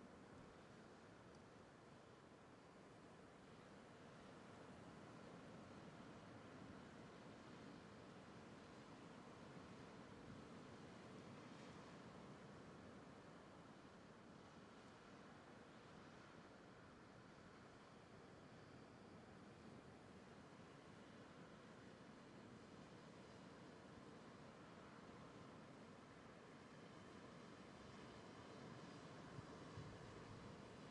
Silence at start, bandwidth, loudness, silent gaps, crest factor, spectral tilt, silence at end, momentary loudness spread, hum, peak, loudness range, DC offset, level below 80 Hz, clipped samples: 0 s; 10.5 kHz; -62 LUFS; none; 20 dB; -5.5 dB/octave; 0 s; 5 LU; none; -42 dBFS; 3 LU; under 0.1%; -82 dBFS; under 0.1%